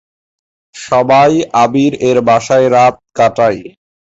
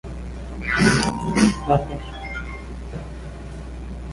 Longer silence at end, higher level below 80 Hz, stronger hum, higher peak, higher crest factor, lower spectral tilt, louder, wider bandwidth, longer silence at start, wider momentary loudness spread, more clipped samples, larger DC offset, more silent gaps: first, 0.45 s vs 0 s; second, -50 dBFS vs -34 dBFS; neither; about the same, 0 dBFS vs -2 dBFS; second, 10 dB vs 20 dB; about the same, -5.5 dB/octave vs -5 dB/octave; first, -11 LUFS vs -21 LUFS; second, 8 kHz vs 11.5 kHz; first, 0.75 s vs 0.05 s; second, 6 LU vs 18 LU; neither; neither; neither